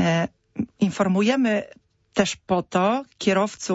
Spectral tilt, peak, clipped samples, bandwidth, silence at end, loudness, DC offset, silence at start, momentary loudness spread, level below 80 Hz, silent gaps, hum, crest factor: -5.5 dB/octave; -6 dBFS; under 0.1%; 8 kHz; 0 s; -23 LUFS; under 0.1%; 0 s; 10 LU; -58 dBFS; none; none; 16 dB